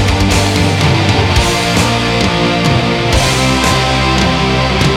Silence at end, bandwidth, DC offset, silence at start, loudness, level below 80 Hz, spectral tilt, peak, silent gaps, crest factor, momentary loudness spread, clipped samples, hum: 0 s; 16.5 kHz; under 0.1%; 0 s; -11 LUFS; -22 dBFS; -4.5 dB/octave; 0 dBFS; none; 12 dB; 1 LU; under 0.1%; none